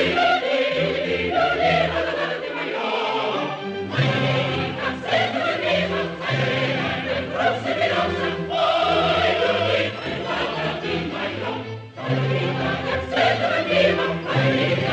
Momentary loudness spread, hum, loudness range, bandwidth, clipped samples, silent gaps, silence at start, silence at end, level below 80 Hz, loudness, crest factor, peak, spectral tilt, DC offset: 7 LU; none; 3 LU; 8.8 kHz; under 0.1%; none; 0 s; 0 s; -50 dBFS; -22 LUFS; 16 dB; -6 dBFS; -6 dB/octave; under 0.1%